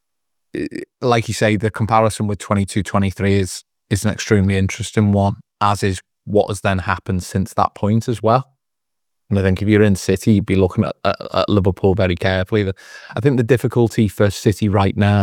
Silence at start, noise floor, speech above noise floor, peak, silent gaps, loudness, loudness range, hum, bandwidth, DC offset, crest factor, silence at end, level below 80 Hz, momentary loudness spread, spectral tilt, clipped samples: 0.55 s; -82 dBFS; 65 dB; 0 dBFS; none; -18 LUFS; 3 LU; none; 15 kHz; under 0.1%; 18 dB; 0 s; -48 dBFS; 7 LU; -6.5 dB/octave; under 0.1%